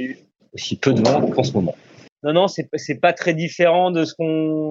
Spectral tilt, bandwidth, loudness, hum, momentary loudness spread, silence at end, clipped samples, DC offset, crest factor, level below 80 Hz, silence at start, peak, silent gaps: -6 dB/octave; 7.8 kHz; -19 LUFS; none; 13 LU; 0 s; under 0.1%; under 0.1%; 18 dB; -62 dBFS; 0 s; -2 dBFS; 2.12-2.16 s